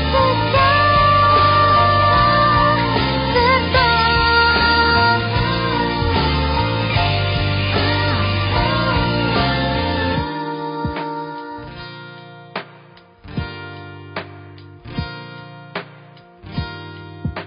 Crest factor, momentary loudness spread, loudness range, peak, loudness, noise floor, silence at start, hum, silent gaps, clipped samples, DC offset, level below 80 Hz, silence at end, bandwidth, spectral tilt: 14 dB; 18 LU; 18 LU; -2 dBFS; -16 LUFS; -45 dBFS; 0 s; none; none; under 0.1%; under 0.1%; -30 dBFS; 0 s; 5.4 kHz; -10.5 dB/octave